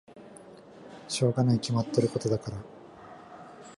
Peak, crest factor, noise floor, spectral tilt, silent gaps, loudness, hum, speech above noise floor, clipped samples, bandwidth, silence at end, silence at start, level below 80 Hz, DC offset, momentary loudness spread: -10 dBFS; 20 dB; -50 dBFS; -6.5 dB/octave; none; -28 LUFS; none; 23 dB; under 0.1%; 11.5 kHz; 0.05 s; 0.1 s; -60 dBFS; under 0.1%; 24 LU